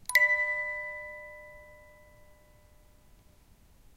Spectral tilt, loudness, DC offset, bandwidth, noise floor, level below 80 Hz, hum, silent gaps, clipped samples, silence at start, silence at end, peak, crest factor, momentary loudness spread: 0 dB/octave; -28 LUFS; under 0.1%; 16 kHz; -59 dBFS; -62 dBFS; none; none; under 0.1%; 0.1 s; 2.15 s; -10 dBFS; 26 dB; 26 LU